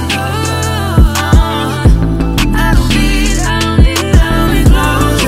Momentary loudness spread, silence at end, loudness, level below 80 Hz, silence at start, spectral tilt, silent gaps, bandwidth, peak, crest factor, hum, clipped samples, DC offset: 5 LU; 0 s; -11 LUFS; -12 dBFS; 0 s; -5 dB/octave; none; 16 kHz; 0 dBFS; 10 dB; none; under 0.1%; under 0.1%